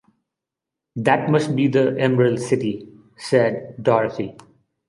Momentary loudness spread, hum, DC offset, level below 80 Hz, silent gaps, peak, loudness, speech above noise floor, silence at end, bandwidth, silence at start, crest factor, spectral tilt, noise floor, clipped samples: 13 LU; none; under 0.1%; -62 dBFS; none; -2 dBFS; -20 LUFS; 66 dB; 0.55 s; 11.5 kHz; 0.95 s; 20 dB; -7 dB/octave; -85 dBFS; under 0.1%